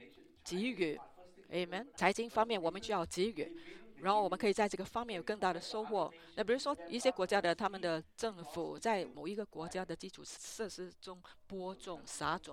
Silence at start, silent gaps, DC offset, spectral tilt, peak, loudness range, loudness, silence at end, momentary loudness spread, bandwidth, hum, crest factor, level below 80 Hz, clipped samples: 0 s; none; under 0.1%; -4 dB/octave; -14 dBFS; 6 LU; -38 LUFS; 0 s; 14 LU; 16 kHz; none; 24 dB; -68 dBFS; under 0.1%